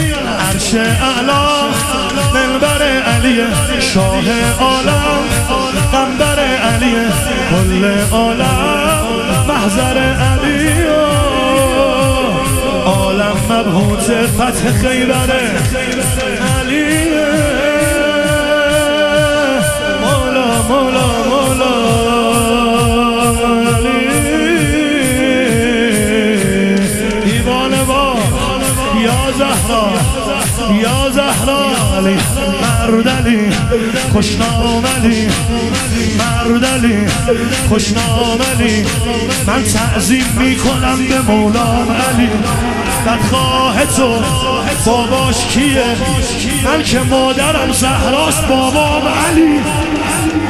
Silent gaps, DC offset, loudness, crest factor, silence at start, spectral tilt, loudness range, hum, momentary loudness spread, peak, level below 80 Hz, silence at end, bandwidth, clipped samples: none; under 0.1%; -12 LUFS; 12 dB; 0 s; -4.5 dB/octave; 1 LU; none; 3 LU; 0 dBFS; -26 dBFS; 0 s; 15.5 kHz; under 0.1%